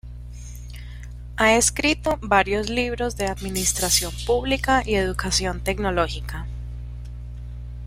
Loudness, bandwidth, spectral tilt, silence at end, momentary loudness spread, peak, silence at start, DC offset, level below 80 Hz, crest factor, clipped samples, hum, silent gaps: -21 LUFS; 16 kHz; -3 dB/octave; 0 s; 19 LU; -2 dBFS; 0.05 s; under 0.1%; -34 dBFS; 22 dB; under 0.1%; 60 Hz at -35 dBFS; none